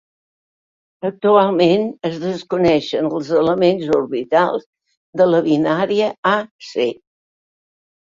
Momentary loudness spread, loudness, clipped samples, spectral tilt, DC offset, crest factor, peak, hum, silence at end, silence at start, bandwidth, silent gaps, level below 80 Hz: 10 LU; -17 LUFS; under 0.1%; -6.5 dB/octave; under 0.1%; 16 dB; -2 dBFS; none; 1.25 s; 1.05 s; 7.6 kHz; 4.66-4.73 s, 4.97-5.13 s, 6.18-6.23 s, 6.51-6.59 s; -56 dBFS